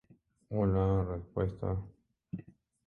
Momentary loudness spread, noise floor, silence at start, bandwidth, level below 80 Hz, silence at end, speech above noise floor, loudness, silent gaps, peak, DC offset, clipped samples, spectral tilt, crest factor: 17 LU; -51 dBFS; 0.5 s; 3.7 kHz; -46 dBFS; 0.45 s; 20 dB; -33 LUFS; none; -18 dBFS; under 0.1%; under 0.1%; -11 dB/octave; 16 dB